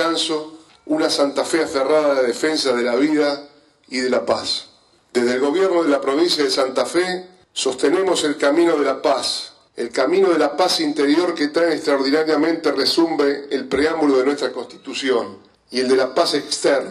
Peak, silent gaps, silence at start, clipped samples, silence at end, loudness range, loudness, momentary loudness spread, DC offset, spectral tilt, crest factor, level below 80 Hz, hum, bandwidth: -2 dBFS; none; 0 s; under 0.1%; 0 s; 2 LU; -19 LUFS; 8 LU; under 0.1%; -3 dB/octave; 16 dB; -60 dBFS; none; 13.5 kHz